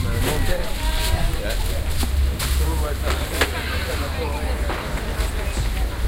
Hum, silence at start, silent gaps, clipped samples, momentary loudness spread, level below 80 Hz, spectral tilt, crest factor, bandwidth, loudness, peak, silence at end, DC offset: none; 0 s; none; under 0.1%; 3 LU; -24 dBFS; -4.5 dB/octave; 18 dB; 17 kHz; -24 LUFS; -4 dBFS; 0 s; under 0.1%